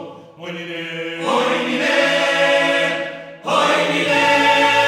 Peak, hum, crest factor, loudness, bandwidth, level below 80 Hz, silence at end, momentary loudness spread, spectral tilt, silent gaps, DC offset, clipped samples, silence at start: -2 dBFS; none; 14 dB; -16 LUFS; 16 kHz; -72 dBFS; 0 s; 16 LU; -3 dB/octave; none; under 0.1%; under 0.1%; 0 s